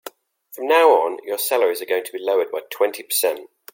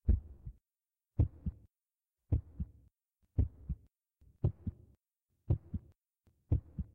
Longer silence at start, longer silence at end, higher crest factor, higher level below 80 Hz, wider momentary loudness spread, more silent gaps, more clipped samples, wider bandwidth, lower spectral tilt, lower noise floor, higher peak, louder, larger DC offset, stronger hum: about the same, 0.05 s vs 0.05 s; first, 0.3 s vs 0.1 s; about the same, 18 dB vs 20 dB; second, -80 dBFS vs -42 dBFS; about the same, 12 LU vs 11 LU; neither; neither; first, 17 kHz vs 2.6 kHz; second, 0 dB/octave vs -12.5 dB/octave; second, -45 dBFS vs under -90 dBFS; first, -2 dBFS vs -18 dBFS; first, -20 LUFS vs -39 LUFS; neither; neither